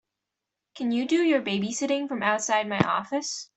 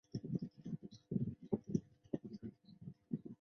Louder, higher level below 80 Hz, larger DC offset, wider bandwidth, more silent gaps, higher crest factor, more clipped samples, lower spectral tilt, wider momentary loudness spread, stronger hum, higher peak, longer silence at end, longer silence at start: first, -26 LUFS vs -45 LUFS; about the same, -66 dBFS vs -70 dBFS; neither; first, 8.4 kHz vs 6.6 kHz; neither; about the same, 22 dB vs 24 dB; neither; second, -4 dB/octave vs -10.5 dB/octave; second, 6 LU vs 13 LU; neither; first, -4 dBFS vs -22 dBFS; about the same, 0.1 s vs 0.05 s; first, 0.75 s vs 0.15 s